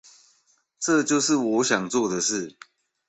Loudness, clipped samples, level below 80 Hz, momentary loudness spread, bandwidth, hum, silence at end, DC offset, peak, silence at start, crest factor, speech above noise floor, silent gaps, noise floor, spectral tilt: -23 LUFS; under 0.1%; -68 dBFS; 9 LU; 8.4 kHz; none; 0.6 s; under 0.1%; -8 dBFS; 0.8 s; 18 dB; 43 dB; none; -66 dBFS; -3 dB/octave